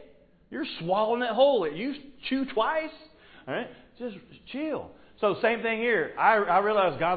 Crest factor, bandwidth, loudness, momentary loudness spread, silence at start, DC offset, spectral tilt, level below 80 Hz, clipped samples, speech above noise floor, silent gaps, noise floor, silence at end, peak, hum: 20 dB; 4.9 kHz; -27 LUFS; 17 LU; 0 s; under 0.1%; -9 dB/octave; -64 dBFS; under 0.1%; 29 dB; none; -55 dBFS; 0 s; -8 dBFS; none